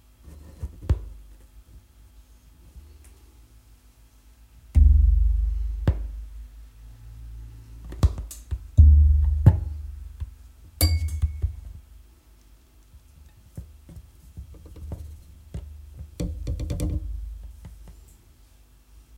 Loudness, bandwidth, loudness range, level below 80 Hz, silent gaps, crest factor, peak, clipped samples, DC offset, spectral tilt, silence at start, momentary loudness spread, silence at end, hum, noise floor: -23 LUFS; 15 kHz; 19 LU; -26 dBFS; none; 22 dB; -2 dBFS; under 0.1%; under 0.1%; -6.5 dB/octave; 0.25 s; 27 LU; 1.25 s; none; -54 dBFS